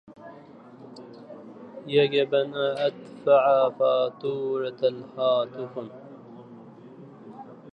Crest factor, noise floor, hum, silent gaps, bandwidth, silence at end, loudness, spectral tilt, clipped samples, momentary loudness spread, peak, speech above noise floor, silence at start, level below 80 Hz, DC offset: 18 dB; -47 dBFS; none; none; 5.6 kHz; 0.05 s; -24 LUFS; -7 dB/octave; under 0.1%; 24 LU; -8 dBFS; 23 dB; 0.1 s; -78 dBFS; under 0.1%